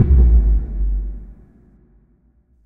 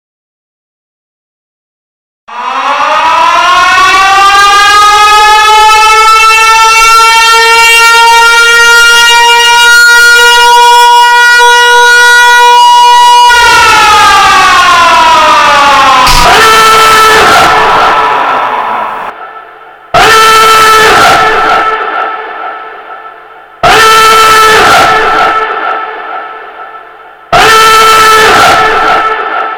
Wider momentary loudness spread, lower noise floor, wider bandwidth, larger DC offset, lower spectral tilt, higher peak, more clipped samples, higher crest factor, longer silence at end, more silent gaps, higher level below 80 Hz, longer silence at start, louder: first, 19 LU vs 10 LU; first, -56 dBFS vs -30 dBFS; second, 1.8 kHz vs over 20 kHz; neither; first, -12.5 dB/octave vs -0.5 dB/octave; about the same, -2 dBFS vs 0 dBFS; second, under 0.1% vs 10%; first, 14 dB vs 4 dB; first, 1.35 s vs 0 s; neither; first, -18 dBFS vs -28 dBFS; second, 0 s vs 2.3 s; second, -18 LUFS vs -2 LUFS